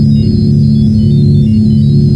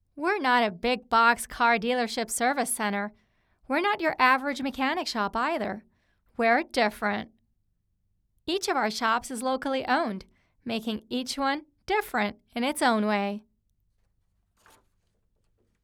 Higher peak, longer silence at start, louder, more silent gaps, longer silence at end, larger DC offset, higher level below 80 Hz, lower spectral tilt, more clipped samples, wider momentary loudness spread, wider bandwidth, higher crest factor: first, 0 dBFS vs -8 dBFS; second, 0 s vs 0.15 s; first, -8 LUFS vs -27 LUFS; neither; second, 0 s vs 2.45 s; neither; first, -24 dBFS vs -60 dBFS; first, -10 dB/octave vs -3 dB/octave; neither; second, 1 LU vs 11 LU; second, 5.6 kHz vs 19 kHz; second, 6 dB vs 20 dB